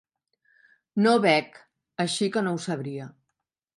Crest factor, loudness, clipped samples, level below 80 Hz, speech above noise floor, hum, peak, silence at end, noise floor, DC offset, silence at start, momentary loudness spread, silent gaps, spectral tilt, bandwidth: 22 dB; -25 LUFS; under 0.1%; -76 dBFS; 58 dB; none; -6 dBFS; 0.65 s; -82 dBFS; under 0.1%; 0.95 s; 20 LU; none; -5 dB/octave; 11.5 kHz